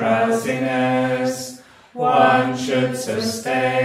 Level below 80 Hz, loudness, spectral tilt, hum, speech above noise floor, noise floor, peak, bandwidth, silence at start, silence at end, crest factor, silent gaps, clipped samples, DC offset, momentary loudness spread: -64 dBFS; -19 LUFS; -5 dB/octave; none; 19 dB; -40 dBFS; -2 dBFS; 16 kHz; 0 s; 0 s; 18 dB; none; under 0.1%; under 0.1%; 9 LU